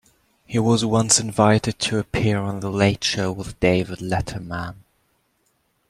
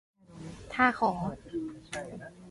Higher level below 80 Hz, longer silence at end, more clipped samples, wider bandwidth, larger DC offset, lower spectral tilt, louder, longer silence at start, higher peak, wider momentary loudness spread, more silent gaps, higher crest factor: first, -46 dBFS vs -58 dBFS; first, 1.15 s vs 0 s; neither; first, 14 kHz vs 11.5 kHz; neither; about the same, -4.5 dB/octave vs -5.5 dB/octave; first, -21 LUFS vs -31 LUFS; first, 0.5 s vs 0.3 s; first, 0 dBFS vs -10 dBFS; second, 11 LU vs 21 LU; neither; about the same, 22 dB vs 24 dB